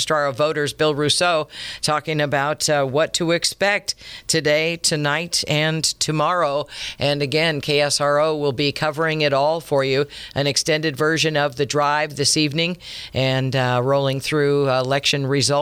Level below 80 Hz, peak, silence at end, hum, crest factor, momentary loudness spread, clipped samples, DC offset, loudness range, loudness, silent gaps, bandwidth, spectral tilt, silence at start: -52 dBFS; -4 dBFS; 0 s; none; 16 dB; 5 LU; under 0.1%; under 0.1%; 1 LU; -19 LUFS; none; 16 kHz; -3.5 dB/octave; 0 s